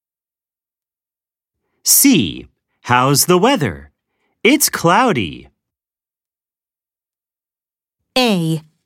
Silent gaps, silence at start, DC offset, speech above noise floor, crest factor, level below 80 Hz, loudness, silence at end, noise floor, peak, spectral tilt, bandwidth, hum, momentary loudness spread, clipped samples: none; 1.85 s; under 0.1%; over 76 dB; 18 dB; -52 dBFS; -14 LUFS; 0.25 s; under -90 dBFS; 0 dBFS; -3.5 dB/octave; 16.5 kHz; none; 13 LU; under 0.1%